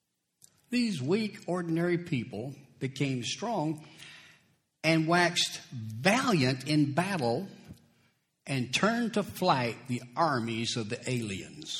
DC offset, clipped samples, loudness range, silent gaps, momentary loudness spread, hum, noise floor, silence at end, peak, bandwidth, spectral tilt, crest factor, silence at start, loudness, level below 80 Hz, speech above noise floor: under 0.1%; under 0.1%; 5 LU; none; 14 LU; none; -70 dBFS; 0 s; -8 dBFS; 16.5 kHz; -5 dB/octave; 24 dB; 0.7 s; -30 LUFS; -68 dBFS; 41 dB